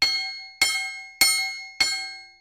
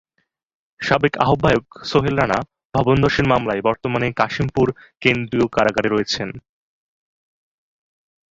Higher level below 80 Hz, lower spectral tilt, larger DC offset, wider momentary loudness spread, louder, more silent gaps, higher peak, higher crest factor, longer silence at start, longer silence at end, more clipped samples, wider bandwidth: second, -62 dBFS vs -44 dBFS; second, 2.5 dB/octave vs -6 dB/octave; neither; first, 13 LU vs 7 LU; second, -23 LUFS vs -19 LUFS; second, none vs 2.65-2.70 s; second, -4 dBFS vs 0 dBFS; about the same, 22 dB vs 20 dB; second, 0 s vs 0.8 s; second, 0.1 s vs 1.9 s; neither; first, 16 kHz vs 7.8 kHz